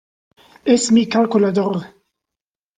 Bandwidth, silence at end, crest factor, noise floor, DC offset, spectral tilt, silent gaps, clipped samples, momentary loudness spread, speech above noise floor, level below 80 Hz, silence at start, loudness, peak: 9.6 kHz; 0.9 s; 16 dB; -87 dBFS; under 0.1%; -5 dB/octave; none; under 0.1%; 11 LU; 72 dB; -60 dBFS; 0.65 s; -17 LUFS; -2 dBFS